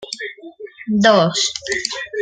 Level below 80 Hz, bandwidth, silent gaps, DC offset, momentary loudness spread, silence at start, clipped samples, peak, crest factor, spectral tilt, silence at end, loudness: -56 dBFS; 9.6 kHz; none; under 0.1%; 21 LU; 0 s; under 0.1%; 0 dBFS; 18 dB; -3.5 dB/octave; 0 s; -16 LUFS